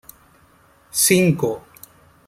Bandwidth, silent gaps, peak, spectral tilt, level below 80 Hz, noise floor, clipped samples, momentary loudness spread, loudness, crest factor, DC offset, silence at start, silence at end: 16 kHz; none; -2 dBFS; -4 dB/octave; -56 dBFS; -54 dBFS; under 0.1%; 12 LU; -17 LUFS; 20 dB; under 0.1%; 0.95 s; 0.7 s